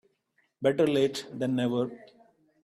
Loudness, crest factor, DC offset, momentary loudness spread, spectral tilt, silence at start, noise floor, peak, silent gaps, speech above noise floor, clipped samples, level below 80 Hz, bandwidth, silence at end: -28 LUFS; 18 dB; under 0.1%; 8 LU; -6 dB/octave; 0.6 s; -73 dBFS; -12 dBFS; none; 45 dB; under 0.1%; -72 dBFS; 14.5 kHz; 0.6 s